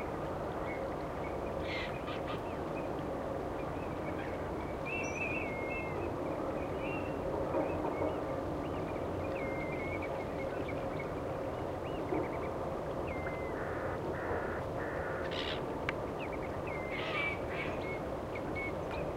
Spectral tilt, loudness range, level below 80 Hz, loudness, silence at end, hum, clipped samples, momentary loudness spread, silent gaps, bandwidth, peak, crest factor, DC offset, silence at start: -6.5 dB/octave; 2 LU; -52 dBFS; -38 LUFS; 0 s; none; under 0.1%; 4 LU; none; 16 kHz; -16 dBFS; 20 dB; under 0.1%; 0 s